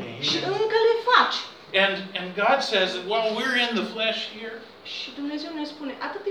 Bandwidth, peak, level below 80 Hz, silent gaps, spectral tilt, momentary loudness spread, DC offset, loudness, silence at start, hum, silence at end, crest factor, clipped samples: 12.5 kHz; -4 dBFS; -76 dBFS; none; -3.5 dB/octave; 14 LU; under 0.1%; -24 LUFS; 0 s; none; 0 s; 22 dB; under 0.1%